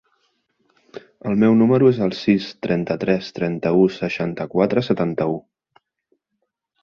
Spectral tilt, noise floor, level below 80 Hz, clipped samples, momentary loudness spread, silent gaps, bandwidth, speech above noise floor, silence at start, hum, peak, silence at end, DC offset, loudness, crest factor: -8 dB/octave; -76 dBFS; -56 dBFS; under 0.1%; 10 LU; none; 6.8 kHz; 57 dB; 0.95 s; none; -4 dBFS; 1.4 s; under 0.1%; -19 LUFS; 18 dB